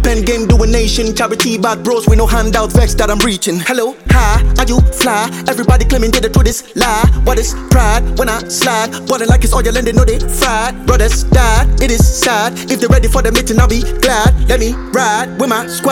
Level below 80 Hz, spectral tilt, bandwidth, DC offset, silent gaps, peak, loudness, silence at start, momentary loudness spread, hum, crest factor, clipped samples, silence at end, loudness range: -14 dBFS; -4.5 dB/octave; 18 kHz; under 0.1%; none; 0 dBFS; -12 LUFS; 0 s; 4 LU; none; 10 dB; under 0.1%; 0 s; 1 LU